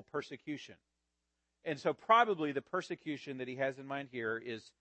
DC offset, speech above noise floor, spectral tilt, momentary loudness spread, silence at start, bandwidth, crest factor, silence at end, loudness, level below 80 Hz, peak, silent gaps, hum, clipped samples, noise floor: under 0.1%; 49 dB; -5.5 dB/octave; 17 LU; 0.15 s; 8.4 kHz; 24 dB; 0.2 s; -36 LUFS; -84 dBFS; -14 dBFS; none; none; under 0.1%; -85 dBFS